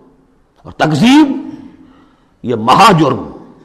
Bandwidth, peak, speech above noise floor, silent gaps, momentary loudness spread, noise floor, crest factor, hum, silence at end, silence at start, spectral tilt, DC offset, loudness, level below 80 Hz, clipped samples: 13.5 kHz; 0 dBFS; 41 dB; none; 20 LU; -50 dBFS; 12 dB; none; 0.25 s; 0.65 s; -5.5 dB/octave; under 0.1%; -10 LUFS; -46 dBFS; under 0.1%